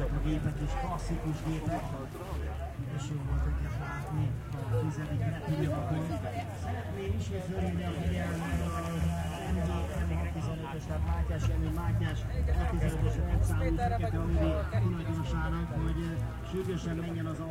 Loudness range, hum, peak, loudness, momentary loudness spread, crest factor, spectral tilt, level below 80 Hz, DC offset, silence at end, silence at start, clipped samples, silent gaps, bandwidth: 4 LU; none; -18 dBFS; -33 LUFS; 6 LU; 14 dB; -7 dB/octave; -36 dBFS; under 0.1%; 0 s; 0 s; under 0.1%; none; 16 kHz